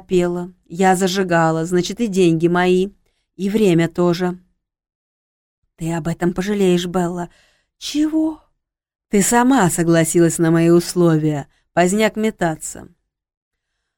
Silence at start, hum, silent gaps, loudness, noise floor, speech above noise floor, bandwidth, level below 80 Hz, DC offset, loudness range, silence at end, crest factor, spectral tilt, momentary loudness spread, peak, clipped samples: 0.1 s; none; 4.95-5.62 s; -17 LUFS; -70 dBFS; 54 dB; 17 kHz; -48 dBFS; under 0.1%; 6 LU; 1.15 s; 16 dB; -5.5 dB/octave; 13 LU; -2 dBFS; under 0.1%